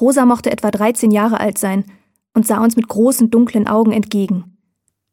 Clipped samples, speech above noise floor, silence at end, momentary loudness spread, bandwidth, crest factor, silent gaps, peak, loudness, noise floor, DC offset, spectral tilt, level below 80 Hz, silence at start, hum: under 0.1%; 55 dB; 0.7 s; 7 LU; 17 kHz; 14 dB; none; -2 dBFS; -15 LUFS; -69 dBFS; under 0.1%; -5.5 dB/octave; -56 dBFS; 0 s; none